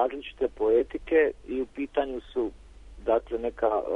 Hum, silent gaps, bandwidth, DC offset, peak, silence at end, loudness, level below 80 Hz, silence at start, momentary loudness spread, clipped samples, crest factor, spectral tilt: none; none; 4.5 kHz; under 0.1%; -12 dBFS; 0 s; -28 LUFS; -50 dBFS; 0 s; 9 LU; under 0.1%; 16 dB; -6.5 dB/octave